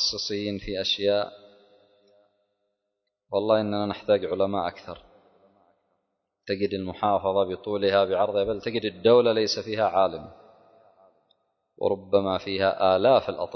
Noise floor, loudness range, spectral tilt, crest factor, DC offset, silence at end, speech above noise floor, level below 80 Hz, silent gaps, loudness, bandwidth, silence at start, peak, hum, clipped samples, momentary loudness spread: -81 dBFS; 6 LU; -5 dB/octave; 20 dB; under 0.1%; 0 s; 57 dB; -56 dBFS; none; -25 LUFS; 6.4 kHz; 0 s; -6 dBFS; none; under 0.1%; 10 LU